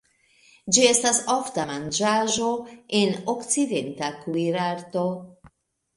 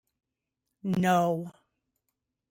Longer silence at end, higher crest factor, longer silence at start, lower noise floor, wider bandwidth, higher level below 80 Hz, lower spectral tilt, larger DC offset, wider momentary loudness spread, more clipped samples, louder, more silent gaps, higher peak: second, 0.5 s vs 1 s; about the same, 22 dB vs 18 dB; second, 0.65 s vs 0.85 s; second, -59 dBFS vs -85 dBFS; second, 11.5 kHz vs 16.5 kHz; first, -64 dBFS vs -70 dBFS; second, -3 dB/octave vs -6.5 dB/octave; neither; second, 12 LU vs 15 LU; neither; first, -23 LUFS vs -27 LUFS; neither; first, -4 dBFS vs -14 dBFS